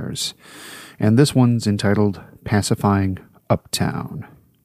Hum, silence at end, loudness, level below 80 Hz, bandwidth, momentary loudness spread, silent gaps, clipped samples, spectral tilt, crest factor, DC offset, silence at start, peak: none; 0.4 s; -19 LUFS; -50 dBFS; 15.5 kHz; 20 LU; none; under 0.1%; -6 dB/octave; 18 dB; under 0.1%; 0 s; -2 dBFS